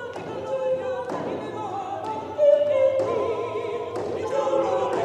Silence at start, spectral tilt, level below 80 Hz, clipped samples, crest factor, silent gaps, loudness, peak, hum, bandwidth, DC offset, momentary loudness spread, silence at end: 0 s; -6 dB/octave; -66 dBFS; under 0.1%; 16 dB; none; -25 LUFS; -8 dBFS; none; 9.2 kHz; under 0.1%; 11 LU; 0 s